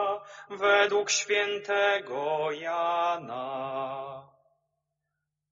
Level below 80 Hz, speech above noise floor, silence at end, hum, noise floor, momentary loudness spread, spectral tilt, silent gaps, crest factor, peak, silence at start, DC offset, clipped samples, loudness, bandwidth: -80 dBFS; 56 dB; 1.25 s; none; -84 dBFS; 14 LU; 0 dB/octave; none; 20 dB; -10 dBFS; 0 s; under 0.1%; under 0.1%; -28 LUFS; 7.4 kHz